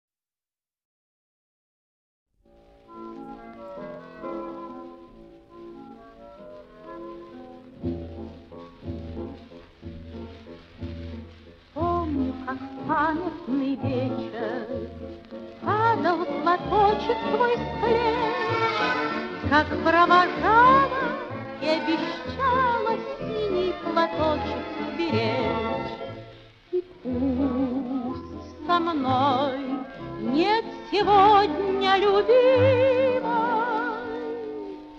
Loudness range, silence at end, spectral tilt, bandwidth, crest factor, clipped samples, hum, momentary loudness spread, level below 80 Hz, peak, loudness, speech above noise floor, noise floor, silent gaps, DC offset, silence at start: 19 LU; 0 s; -7 dB/octave; 7.6 kHz; 22 dB; under 0.1%; none; 22 LU; -50 dBFS; -4 dBFS; -24 LUFS; over 67 dB; under -90 dBFS; none; under 0.1%; 2.9 s